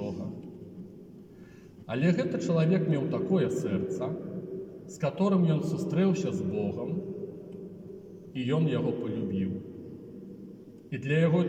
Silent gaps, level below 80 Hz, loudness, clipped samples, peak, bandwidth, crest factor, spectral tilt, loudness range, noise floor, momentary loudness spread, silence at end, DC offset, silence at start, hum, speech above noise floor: none; -68 dBFS; -30 LUFS; under 0.1%; -14 dBFS; 8.8 kHz; 16 dB; -8 dB/octave; 4 LU; -50 dBFS; 20 LU; 0 s; under 0.1%; 0 s; none; 23 dB